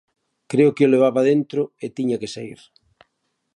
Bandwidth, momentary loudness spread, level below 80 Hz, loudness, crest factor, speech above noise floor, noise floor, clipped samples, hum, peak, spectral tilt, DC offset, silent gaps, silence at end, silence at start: 11 kHz; 15 LU; -68 dBFS; -19 LUFS; 16 dB; 54 dB; -73 dBFS; under 0.1%; none; -4 dBFS; -7 dB/octave; under 0.1%; none; 1 s; 0.5 s